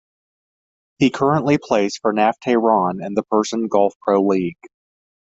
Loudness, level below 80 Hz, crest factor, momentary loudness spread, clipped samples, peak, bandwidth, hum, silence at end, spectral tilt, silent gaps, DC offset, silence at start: -18 LUFS; -60 dBFS; 18 dB; 4 LU; under 0.1%; -2 dBFS; 8 kHz; none; 0.7 s; -6 dB/octave; 3.95-4.00 s; under 0.1%; 1 s